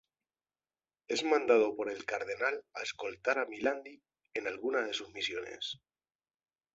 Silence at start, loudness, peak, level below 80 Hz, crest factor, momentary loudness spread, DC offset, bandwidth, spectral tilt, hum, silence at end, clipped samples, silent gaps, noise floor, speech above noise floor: 1.1 s; -34 LUFS; -12 dBFS; -76 dBFS; 24 dB; 13 LU; under 0.1%; 8 kHz; 0 dB/octave; none; 1 s; under 0.1%; none; under -90 dBFS; over 56 dB